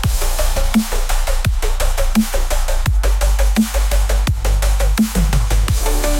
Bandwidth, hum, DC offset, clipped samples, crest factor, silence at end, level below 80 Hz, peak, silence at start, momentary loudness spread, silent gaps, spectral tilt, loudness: 17 kHz; none; under 0.1%; under 0.1%; 12 dB; 0 s; -16 dBFS; -4 dBFS; 0 s; 4 LU; none; -4.5 dB/octave; -18 LUFS